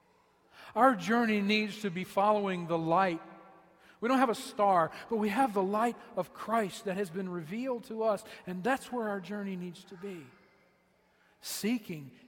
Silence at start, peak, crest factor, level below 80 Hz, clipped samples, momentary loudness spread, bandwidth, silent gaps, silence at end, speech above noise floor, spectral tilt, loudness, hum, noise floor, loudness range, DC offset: 0.55 s; -10 dBFS; 22 dB; -74 dBFS; under 0.1%; 14 LU; 16.5 kHz; none; 0.15 s; 38 dB; -5 dB/octave; -31 LUFS; none; -69 dBFS; 9 LU; under 0.1%